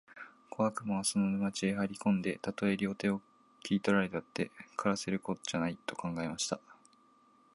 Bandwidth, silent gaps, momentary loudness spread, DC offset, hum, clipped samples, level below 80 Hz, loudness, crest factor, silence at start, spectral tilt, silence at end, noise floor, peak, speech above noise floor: 11.5 kHz; none; 8 LU; under 0.1%; none; under 0.1%; -68 dBFS; -34 LUFS; 20 dB; 0.1 s; -5 dB/octave; 0.8 s; -66 dBFS; -14 dBFS; 32 dB